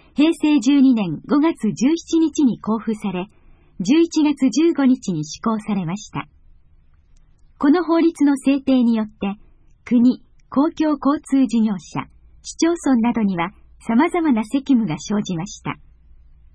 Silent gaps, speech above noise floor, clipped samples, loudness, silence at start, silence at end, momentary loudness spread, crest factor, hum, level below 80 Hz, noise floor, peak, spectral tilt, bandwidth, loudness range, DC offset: none; 33 dB; under 0.1%; -19 LUFS; 0.2 s; 0.8 s; 13 LU; 14 dB; none; -50 dBFS; -51 dBFS; -6 dBFS; -5.5 dB/octave; 10.5 kHz; 3 LU; under 0.1%